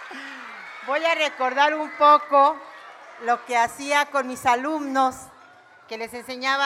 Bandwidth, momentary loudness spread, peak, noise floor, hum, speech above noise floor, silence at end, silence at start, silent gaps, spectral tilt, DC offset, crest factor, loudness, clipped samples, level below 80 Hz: 16 kHz; 20 LU; -4 dBFS; -50 dBFS; none; 29 dB; 0 s; 0 s; none; -2 dB/octave; under 0.1%; 18 dB; -21 LUFS; under 0.1%; -68 dBFS